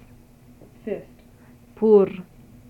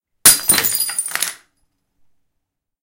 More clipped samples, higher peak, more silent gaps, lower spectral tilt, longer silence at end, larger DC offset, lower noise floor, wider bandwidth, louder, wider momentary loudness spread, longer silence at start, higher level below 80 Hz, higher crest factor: second, under 0.1% vs 0.1%; second, -6 dBFS vs 0 dBFS; neither; first, -9.5 dB/octave vs 0.5 dB/octave; second, 0.45 s vs 1.5 s; neither; second, -50 dBFS vs -76 dBFS; second, 4.3 kHz vs 19 kHz; second, -20 LUFS vs -14 LUFS; first, 22 LU vs 12 LU; first, 0.85 s vs 0.25 s; second, -56 dBFS vs -50 dBFS; about the same, 20 dB vs 20 dB